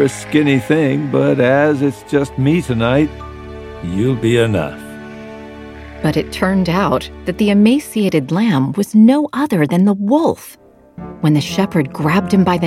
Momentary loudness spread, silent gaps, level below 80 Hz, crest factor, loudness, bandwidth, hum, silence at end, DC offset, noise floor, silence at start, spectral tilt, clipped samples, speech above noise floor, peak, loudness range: 19 LU; none; -40 dBFS; 14 dB; -15 LUFS; 15 kHz; none; 0 s; under 0.1%; -34 dBFS; 0 s; -7 dB/octave; under 0.1%; 20 dB; 0 dBFS; 5 LU